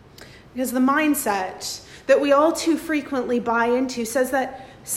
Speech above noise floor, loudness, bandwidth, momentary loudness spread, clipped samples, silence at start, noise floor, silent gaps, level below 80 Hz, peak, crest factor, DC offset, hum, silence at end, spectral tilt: 24 dB; -21 LUFS; 16 kHz; 13 LU; under 0.1%; 0.2 s; -45 dBFS; none; -56 dBFS; -4 dBFS; 18 dB; under 0.1%; none; 0 s; -3 dB/octave